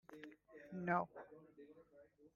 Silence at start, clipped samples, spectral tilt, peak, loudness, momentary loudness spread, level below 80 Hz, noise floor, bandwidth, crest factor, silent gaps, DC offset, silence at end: 0.1 s; under 0.1%; -8.5 dB/octave; -24 dBFS; -43 LUFS; 23 LU; -82 dBFS; -68 dBFS; 6.8 kHz; 24 dB; none; under 0.1%; 0.1 s